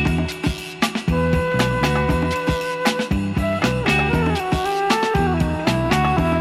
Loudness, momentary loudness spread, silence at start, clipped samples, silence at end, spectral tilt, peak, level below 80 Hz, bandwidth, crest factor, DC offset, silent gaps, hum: -20 LUFS; 4 LU; 0 s; under 0.1%; 0 s; -5.5 dB/octave; -4 dBFS; -30 dBFS; 15.5 kHz; 16 dB; under 0.1%; none; none